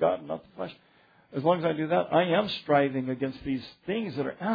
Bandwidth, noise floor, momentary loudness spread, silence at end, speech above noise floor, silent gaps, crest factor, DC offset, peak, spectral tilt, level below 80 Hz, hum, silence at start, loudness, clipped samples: 5 kHz; -61 dBFS; 14 LU; 0 s; 34 dB; none; 18 dB; under 0.1%; -10 dBFS; -8.5 dB/octave; -64 dBFS; none; 0 s; -28 LUFS; under 0.1%